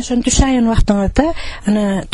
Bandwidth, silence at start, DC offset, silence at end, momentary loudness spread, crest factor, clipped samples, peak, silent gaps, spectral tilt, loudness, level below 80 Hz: 11.5 kHz; 0 s; under 0.1%; 0 s; 5 LU; 12 dB; under 0.1%; -2 dBFS; none; -5 dB/octave; -15 LUFS; -22 dBFS